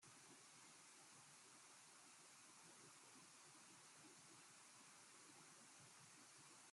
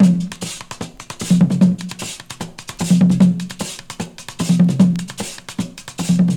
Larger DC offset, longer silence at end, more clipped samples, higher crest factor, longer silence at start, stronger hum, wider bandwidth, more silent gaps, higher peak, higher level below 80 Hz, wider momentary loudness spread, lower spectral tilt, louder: neither; about the same, 0 s vs 0 s; neither; about the same, 16 dB vs 16 dB; about the same, 0 s vs 0 s; neither; about the same, 13.5 kHz vs 13.5 kHz; neither; second, -50 dBFS vs -2 dBFS; second, under -90 dBFS vs -50 dBFS; second, 0 LU vs 17 LU; second, -1 dB/octave vs -6 dB/octave; second, -64 LUFS vs -18 LUFS